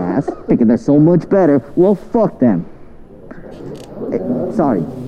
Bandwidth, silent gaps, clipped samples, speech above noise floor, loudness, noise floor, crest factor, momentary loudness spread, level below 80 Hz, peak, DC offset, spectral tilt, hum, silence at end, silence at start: 8.8 kHz; none; under 0.1%; 22 dB; -14 LUFS; -35 dBFS; 12 dB; 20 LU; -42 dBFS; -2 dBFS; under 0.1%; -10 dB/octave; none; 0 s; 0 s